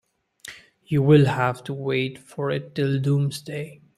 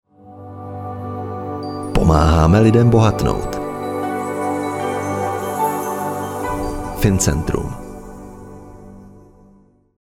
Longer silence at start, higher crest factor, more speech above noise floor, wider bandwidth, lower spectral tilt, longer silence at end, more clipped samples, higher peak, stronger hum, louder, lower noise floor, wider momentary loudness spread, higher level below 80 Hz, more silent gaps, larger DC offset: first, 0.45 s vs 0.25 s; about the same, 20 dB vs 18 dB; second, 23 dB vs 38 dB; second, 12.5 kHz vs 17 kHz; about the same, -7.5 dB/octave vs -6.5 dB/octave; second, 0.25 s vs 0.85 s; neither; second, -4 dBFS vs 0 dBFS; neither; second, -23 LUFS vs -18 LUFS; second, -45 dBFS vs -51 dBFS; about the same, 22 LU vs 23 LU; second, -60 dBFS vs -30 dBFS; neither; neither